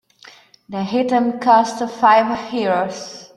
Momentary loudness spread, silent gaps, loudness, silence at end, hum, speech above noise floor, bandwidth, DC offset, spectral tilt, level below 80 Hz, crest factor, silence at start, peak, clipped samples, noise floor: 13 LU; none; -17 LUFS; 0.1 s; none; 29 dB; 11.5 kHz; under 0.1%; -5 dB/octave; -60 dBFS; 16 dB; 0.7 s; -2 dBFS; under 0.1%; -46 dBFS